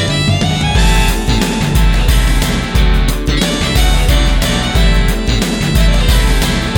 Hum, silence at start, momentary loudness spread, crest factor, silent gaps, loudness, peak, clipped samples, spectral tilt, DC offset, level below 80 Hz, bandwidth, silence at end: none; 0 s; 3 LU; 10 dB; none; -13 LUFS; 0 dBFS; under 0.1%; -4.5 dB/octave; under 0.1%; -12 dBFS; 18 kHz; 0 s